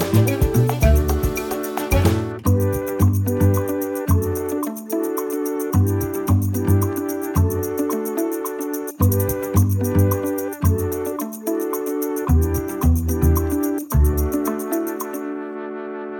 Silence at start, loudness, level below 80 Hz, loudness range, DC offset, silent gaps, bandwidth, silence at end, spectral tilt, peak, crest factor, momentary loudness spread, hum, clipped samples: 0 s; -21 LUFS; -28 dBFS; 2 LU; under 0.1%; none; 18 kHz; 0 s; -7 dB/octave; -4 dBFS; 16 dB; 7 LU; none; under 0.1%